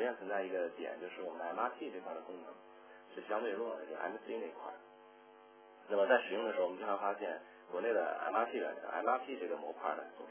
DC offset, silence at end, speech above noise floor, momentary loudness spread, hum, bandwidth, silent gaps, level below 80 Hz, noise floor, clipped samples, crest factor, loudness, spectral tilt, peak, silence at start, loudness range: under 0.1%; 0 s; 21 dB; 15 LU; none; 3.5 kHz; none; under -90 dBFS; -60 dBFS; under 0.1%; 24 dB; -39 LUFS; -1.5 dB/octave; -16 dBFS; 0 s; 8 LU